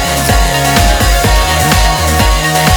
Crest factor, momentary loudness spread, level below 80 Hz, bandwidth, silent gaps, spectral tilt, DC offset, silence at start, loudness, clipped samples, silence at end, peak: 10 dB; 1 LU; -14 dBFS; 19.5 kHz; none; -3.5 dB/octave; under 0.1%; 0 s; -10 LUFS; under 0.1%; 0 s; 0 dBFS